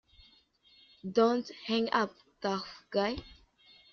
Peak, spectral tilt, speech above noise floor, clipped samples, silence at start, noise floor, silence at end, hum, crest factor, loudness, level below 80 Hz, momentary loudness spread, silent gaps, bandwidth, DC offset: -12 dBFS; -3 dB/octave; 33 dB; under 0.1%; 1.05 s; -65 dBFS; 0.65 s; none; 22 dB; -32 LUFS; -62 dBFS; 10 LU; none; 6.8 kHz; under 0.1%